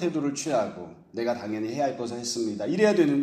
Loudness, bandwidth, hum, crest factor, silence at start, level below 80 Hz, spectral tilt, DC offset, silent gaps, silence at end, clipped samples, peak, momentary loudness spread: -27 LUFS; 14 kHz; none; 18 dB; 0 s; -68 dBFS; -5 dB/octave; under 0.1%; none; 0 s; under 0.1%; -8 dBFS; 10 LU